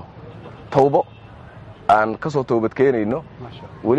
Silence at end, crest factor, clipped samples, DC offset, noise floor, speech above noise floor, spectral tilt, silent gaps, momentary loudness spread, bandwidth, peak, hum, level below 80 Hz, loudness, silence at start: 0 s; 18 dB; under 0.1%; under 0.1%; -40 dBFS; 22 dB; -8 dB/octave; none; 22 LU; 8.6 kHz; -2 dBFS; none; -50 dBFS; -19 LUFS; 0 s